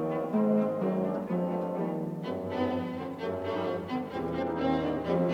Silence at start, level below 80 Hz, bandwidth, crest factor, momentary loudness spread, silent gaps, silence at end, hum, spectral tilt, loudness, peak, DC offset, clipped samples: 0 s; -64 dBFS; 14 kHz; 14 dB; 7 LU; none; 0 s; none; -8.5 dB/octave; -31 LUFS; -16 dBFS; under 0.1%; under 0.1%